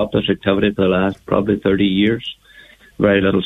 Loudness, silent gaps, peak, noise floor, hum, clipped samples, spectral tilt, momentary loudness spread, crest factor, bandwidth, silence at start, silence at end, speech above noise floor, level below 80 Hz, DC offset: -17 LUFS; none; 0 dBFS; -45 dBFS; none; under 0.1%; -8 dB/octave; 4 LU; 16 dB; 4 kHz; 0 s; 0 s; 29 dB; -42 dBFS; under 0.1%